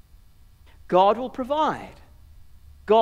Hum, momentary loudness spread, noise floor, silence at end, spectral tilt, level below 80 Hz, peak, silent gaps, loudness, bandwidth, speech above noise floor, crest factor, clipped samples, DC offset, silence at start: none; 21 LU; -51 dBFS; 0 s; -6.5 dB/octave; -52 dBFS; -6 dBFS; none; -23 LUFS; 15 kHz; 29 dB; 18 dB; under 0.1%; under 0.1%; 0.9 s